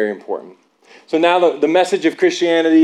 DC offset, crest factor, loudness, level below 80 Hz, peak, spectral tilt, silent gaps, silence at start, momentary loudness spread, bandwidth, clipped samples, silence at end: under 0.1%; 12 dB; -15 LUFS; -80 dBFS; -2 dBFS; -4 dB/octave; none; 0 s; 13 LU; 10.5 kHz; under 0.1%; 0 s